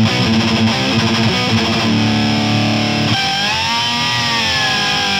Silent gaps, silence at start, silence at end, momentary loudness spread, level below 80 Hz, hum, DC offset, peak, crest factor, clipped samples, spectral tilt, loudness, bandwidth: none; 0 s; 0 s; 1 LU; -42 dBFS; none; 0.3%; -2 dBFS; 12 dB; under 0.1%; -4 dB/octave; -14 LUFS; 16.5 kHz